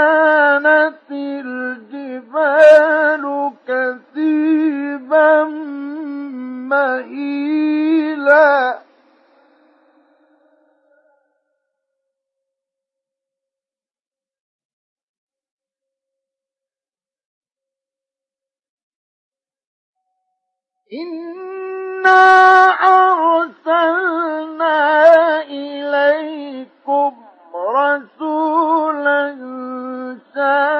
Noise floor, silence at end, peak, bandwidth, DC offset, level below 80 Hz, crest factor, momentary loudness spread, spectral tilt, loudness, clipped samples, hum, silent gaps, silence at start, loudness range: under -90 dBFS; 0 s; 0 dBFS; 8.6 kHz; under 0.1%; -72 dBFS; 16 dB; 18 LU; -3.5 dB/octave; -14 LUFS; under 0.1%; none; 14.40-14.59 s, 14.65-14.96 s, 15.03-15.27 s, 15.51-15.57 s, 17.25-17.41 s, 18.69-19.32 s, 19.67-19.93 s; 0 s; 7 LU